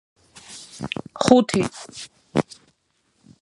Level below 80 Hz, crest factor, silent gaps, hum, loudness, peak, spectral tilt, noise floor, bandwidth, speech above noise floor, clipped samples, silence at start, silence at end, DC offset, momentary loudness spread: -56 dBFS; 24 dB; none; none; -21 LUFS; 0 dBFS; -5 dB/octave; -68 dBFS; 11.5 kHz; 47 dB; under 0.1%; 0.5 s; 1 s; under 0.1%; 22 LU